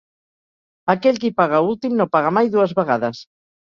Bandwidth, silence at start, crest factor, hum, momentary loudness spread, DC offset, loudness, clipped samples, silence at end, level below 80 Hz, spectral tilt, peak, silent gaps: 7.2 kHz; 0.85 s; 18 dB; none; 7 LU; under 0.1%; -18 LUFS; under 0.1%; 0.4 s; -64 dBFS; -7 dB/octave; -2 dBFS; none